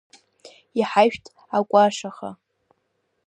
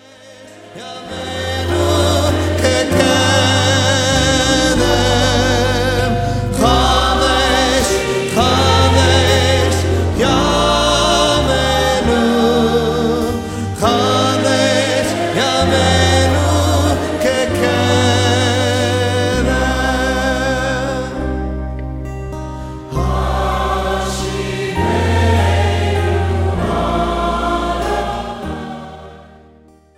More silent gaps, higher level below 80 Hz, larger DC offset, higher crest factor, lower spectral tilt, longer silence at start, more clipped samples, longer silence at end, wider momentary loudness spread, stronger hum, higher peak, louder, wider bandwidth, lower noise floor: neither; second, -68 dBFS vs -26 dBFS; neither; first, 20 dB vs 14 dB; about the same, -4.5 dB/octave vs -4.5 dB/octave; first, 0.75 s vs 0.25 s; neither; first, 0.95 s vs 0.75 s; first, 19 LU vs 10 LU; neither; second, -4 dBFS vs 0 dBFS; second, -21 LUFS vs -14 LUFS; second, 10 kHz vs 15.5 kHz; first, -72 dBFS vs -46 dBFS